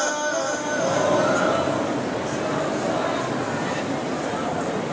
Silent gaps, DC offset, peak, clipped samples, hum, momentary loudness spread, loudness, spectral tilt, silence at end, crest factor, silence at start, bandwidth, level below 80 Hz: none; under 0.1%; -8 dBFS; under 0.1%; none; 6 LU; -24 LUFS; -4 dB/octave; 0 s; 14 dB; 0 s; 8 kHz; -54 dBFS